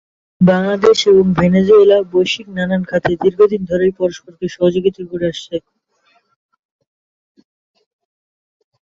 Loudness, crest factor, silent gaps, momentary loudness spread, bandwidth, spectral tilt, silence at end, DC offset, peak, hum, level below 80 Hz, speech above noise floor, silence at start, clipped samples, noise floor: -14 LUFS; 14 dB; none; 12 LU; 7.6 kHz; -6.5 dB/octave; 3.35 s; under 0.1%; -2 dBFS; none; -48 dBFS; 46 dB; 0.4 s; under 0.1%; -59 dBFS